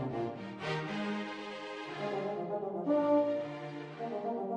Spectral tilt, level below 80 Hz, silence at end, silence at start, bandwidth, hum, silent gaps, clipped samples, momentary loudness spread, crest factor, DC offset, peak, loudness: -7 dB/octave; -76 dBFS; 0 s; 0 s; 9.8 kHz; none; none; under 0.1%; 12 LU; 16 dB; under 0.1%; -18 dBFS; -36 LUFS